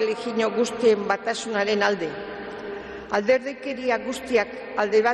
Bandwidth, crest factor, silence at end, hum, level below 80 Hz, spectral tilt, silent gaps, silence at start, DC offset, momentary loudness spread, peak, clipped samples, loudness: 12.5 kHz; 16 dB; 0 s; none; -60 dBFS; -4 dB/octave; none; 0 s; under 0.1%; 13 LU; -8 dBFS; under 0.1%; -24 LUFS